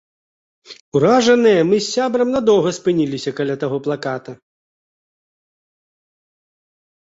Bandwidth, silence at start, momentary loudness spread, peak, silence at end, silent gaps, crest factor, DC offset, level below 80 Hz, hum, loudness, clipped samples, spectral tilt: 8 kHz; 0.7 s; 10 LU; -2 dBFS; 2.65 s; 0.80-0.92 s; 16 dB; under 0.1%; -60 dBFS; none; -17 LUFS; under 0.1%; -5 dB/octave